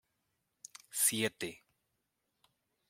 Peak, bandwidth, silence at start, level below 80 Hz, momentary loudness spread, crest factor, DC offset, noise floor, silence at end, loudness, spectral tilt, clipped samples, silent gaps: -16 dBFS; 16.5 kHz; 0.95 s; -80 dBFS; 23 LU; 26 dB; under 0.1%; -84 dBFS; 1.35 s; -33 LUFS; -1.5 dB/octave; under 0.1%; none